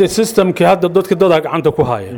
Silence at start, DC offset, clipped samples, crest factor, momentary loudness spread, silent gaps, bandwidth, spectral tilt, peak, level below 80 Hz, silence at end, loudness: 0 s; under 0.1%; under 0.1%; 12 dB; 4 LU; none; 19 kHz; -5.5 dB/octave; -2 dBFS; -44 dBFS; 0 s; -13 LUFS